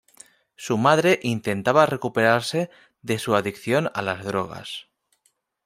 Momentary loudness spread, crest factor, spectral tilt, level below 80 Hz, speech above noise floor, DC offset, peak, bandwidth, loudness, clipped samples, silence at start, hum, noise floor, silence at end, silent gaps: 15 LU; 22 dB; -5 dB/octave; -64 dBFS; 47 dB; under 0.1%; -2 dBFS; 16 kHz; -22 LUFS; under 0.1%; 0.6 s; none; -69 dBFS; 0.85 s; none